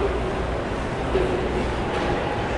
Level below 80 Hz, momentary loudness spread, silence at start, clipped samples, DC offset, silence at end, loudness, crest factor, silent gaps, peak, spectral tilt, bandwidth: -32 dBFS; 4 LU; 0 s; under 0.1%; under 0.1%; 0 s; -25 LUFS; 14 dB; none; -10 dBFS; -6.5 dB/octave; 11.5 kHz